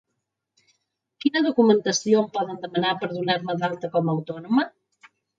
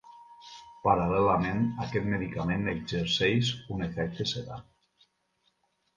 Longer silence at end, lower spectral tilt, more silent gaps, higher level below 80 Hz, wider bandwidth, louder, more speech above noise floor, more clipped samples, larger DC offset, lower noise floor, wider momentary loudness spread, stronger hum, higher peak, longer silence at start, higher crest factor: second, 0.7 s vs 1.35 s; about the same, -5 dB/octave vs -6 dB/octave; neither; second, -72 dBFS vs -52 dBFS; second, 7.8 kHz vs 9.8 kHz; first, -23 LUFS vs -29 LUFS; first, 57 dB vs 45 dB; neither; neither; first, -80 dBFS vs -74 dBFS; second, 9 LU vs 19 LU; neither; about the same, -6 dBFS vs -8 dBFS; first, 1.25 s vs 0.05 s; about the same, 20 dB vs 22 dB